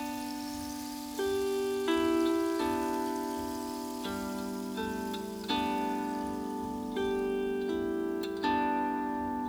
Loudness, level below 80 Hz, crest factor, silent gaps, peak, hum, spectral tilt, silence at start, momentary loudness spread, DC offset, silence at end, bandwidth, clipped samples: -33 LUFS; -58 dBFS; 16 dB; none; -16 dBFS; none; -4.5 dB/octave; 0 s; 8 LU; under 0.1%; 0 s; over 20 kHz; under 0.1%